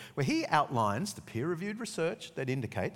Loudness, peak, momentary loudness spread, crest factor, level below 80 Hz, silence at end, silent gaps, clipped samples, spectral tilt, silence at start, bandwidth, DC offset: -33 LUFS; -10 dBFS; 8 LU; 22 dB; -68 dBFS; 0 s; none; under 0.1%; -5.5 dB/octave; 0 s; 17 kHz; under 0.1%